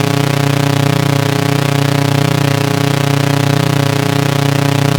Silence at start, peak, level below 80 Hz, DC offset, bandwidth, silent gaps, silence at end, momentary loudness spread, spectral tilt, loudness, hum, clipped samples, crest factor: 0 s; 0 dBFS; -58 dBFS; under 0.1%; 19 kHz; none; 0 s; 1 LU; -5.5 dB/octave; -13 LUFS; none; under 0.1%; 12 dB